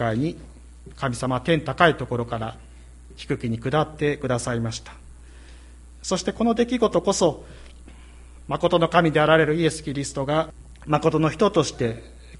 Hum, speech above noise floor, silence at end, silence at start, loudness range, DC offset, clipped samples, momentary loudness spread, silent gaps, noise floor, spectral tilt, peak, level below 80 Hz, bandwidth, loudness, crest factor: none; 22 dB; 0 s; 0 s; 6 LU; under 0.1%; under 0.1%; 13 LU; none; -44 dBFS; -5.5 dB/octave; -2 dBFS; -44 dBFS; 11.5 kHz; -23 LUFS; 22 dB